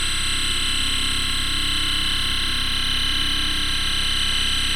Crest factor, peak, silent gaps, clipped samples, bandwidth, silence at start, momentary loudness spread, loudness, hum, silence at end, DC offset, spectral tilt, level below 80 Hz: 12 dB; -10 dBFS; none; under 0.1%; 16.5 kHz; 0 s; 1 LU; -20 LUFS; 50 Hz at -35 dBFS; 0 s; under 0.1%; -1 dB/octave; -28 dBFS